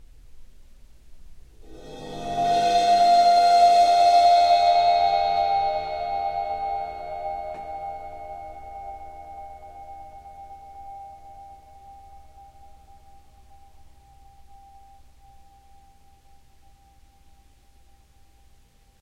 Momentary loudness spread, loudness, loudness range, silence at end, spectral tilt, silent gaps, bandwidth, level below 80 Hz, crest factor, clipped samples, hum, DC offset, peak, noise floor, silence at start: 26 LU; -20 LUFS; 24 LU; 6.85 s; -3 dB/octave; none; 12 kHz; -52 dBFS; 18 dB; under 0.1%; none; under 0.1%; -8 dBFS; -56 dBFS; 0.35 s